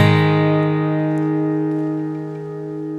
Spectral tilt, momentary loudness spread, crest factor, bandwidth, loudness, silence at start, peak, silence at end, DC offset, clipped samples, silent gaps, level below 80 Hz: -8.5 dB/octave; 13 LU; 18 dB; 6.8 kHz; -19 LUFS; 0 s; 0 dBFS; 0 s; under 0.1%; under 0.1%; none; -62 dBFS